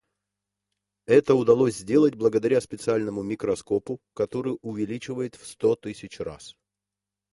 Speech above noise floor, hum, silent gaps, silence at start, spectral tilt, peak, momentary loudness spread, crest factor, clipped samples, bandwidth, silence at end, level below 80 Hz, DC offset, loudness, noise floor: 64 dB; 50 Hz at -55 dBFS; none; 1.1 s; -6.5 dB/octave; -6 dBFS; 16 LU; 20 dB; under 0.1%; 11.5 kHz; 0.85 s; -60 dBFS; under 0.1%; -24 LUFS; -88 dBFS